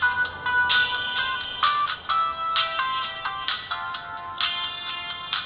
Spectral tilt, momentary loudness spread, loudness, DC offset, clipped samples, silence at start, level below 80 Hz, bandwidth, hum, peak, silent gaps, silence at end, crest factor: -4.5 dB/octave; 10 LU; -25 LUFS; under 0.1%; under 0.1%; 0 s; -58 dBFS; 5.6 kHz; none; -8 dBFS; none; 0 s; 18 dB